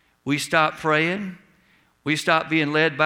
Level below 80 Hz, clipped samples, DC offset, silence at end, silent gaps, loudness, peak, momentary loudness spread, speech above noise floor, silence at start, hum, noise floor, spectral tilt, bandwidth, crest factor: -64 dBFS; under 0.1%; under 0.1%; 0 s; none; -21 LUFS; -2 dBFS; 10 LU; 39 dB; 0.25 s; none; -60 dBFS; -4.5 dB/octave; 16.5 kHz; 20 dB